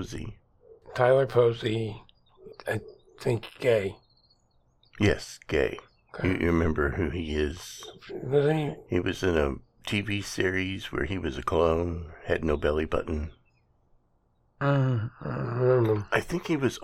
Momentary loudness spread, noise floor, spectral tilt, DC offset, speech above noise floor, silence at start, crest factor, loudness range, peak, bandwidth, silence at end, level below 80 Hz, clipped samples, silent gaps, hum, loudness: 14 LU; -68 dBFS; -6.5 dB/octave; under 0.1%; 41 dB; 0 s; 20 dB; 3 LU; -8 dBFS; 14.5 kHz; 0 s; -44 dBFS; under 0.1%; none; none; -28 LUFS